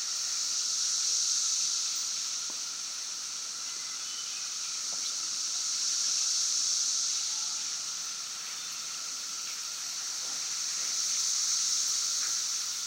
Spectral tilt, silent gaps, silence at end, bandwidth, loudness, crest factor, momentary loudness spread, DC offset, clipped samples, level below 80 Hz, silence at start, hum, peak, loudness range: 4 dB/octave; none; 0 s; 16 kHz; -29 LUFS; 16 dB; 8 LU; under 0.1%; under 0.1%; under -90 dBFS; 0 s; none; -16 dBFS; 5 LU